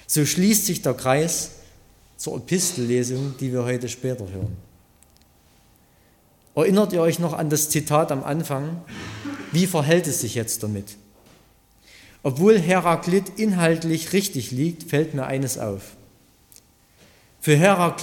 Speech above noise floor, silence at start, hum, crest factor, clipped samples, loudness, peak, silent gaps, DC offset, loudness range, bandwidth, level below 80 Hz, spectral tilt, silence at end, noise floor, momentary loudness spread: 36 dB; 0.1 s; none; 20 dB; under 0.1%; -22 LUFS; -4 dBFS; none; under 0.1%; 6 LU; 17.5 kHz; -56 dBFS; -5 dB/octave; 0 s; -57 dBFS; 14 LU